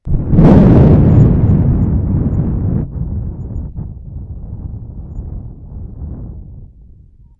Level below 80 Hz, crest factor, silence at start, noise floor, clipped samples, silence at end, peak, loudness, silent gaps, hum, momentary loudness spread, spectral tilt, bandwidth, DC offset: -22 dBFS; 12 dB; 0.05 s; -41 dBFS; under 0.1%; 0.75 s; 0 dBFS; -11 LUFS; none; none; 23 LU; -11.5 dB/octave; 4.6 kHz; under 0.1%